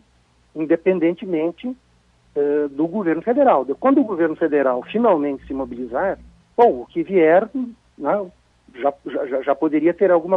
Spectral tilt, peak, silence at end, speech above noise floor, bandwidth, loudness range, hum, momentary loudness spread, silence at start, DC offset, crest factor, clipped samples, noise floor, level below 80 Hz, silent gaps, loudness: -9 dB/octave; -2 dBFS; 0 s; 40 dB; 4.3 kHz; 2 LU; none; 12 LU; 0.55 s; under 0.1%; 18 dB; under 0.1%; -58 dBFS; -56 dBFS; none; -20 LUFS